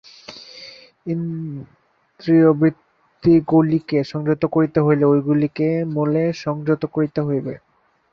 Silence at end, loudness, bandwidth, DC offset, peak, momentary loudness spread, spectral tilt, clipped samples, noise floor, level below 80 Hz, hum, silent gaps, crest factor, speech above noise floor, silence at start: 0.55 s; -19 LUFS; 6.6 kHz; under 0.1%; -4 dBFS; 21 LU; -9 dB/octave; under 0.1%; -42 dBFS; -56 dBFS; none; none; 16 dB; 24 dB; 0.3 s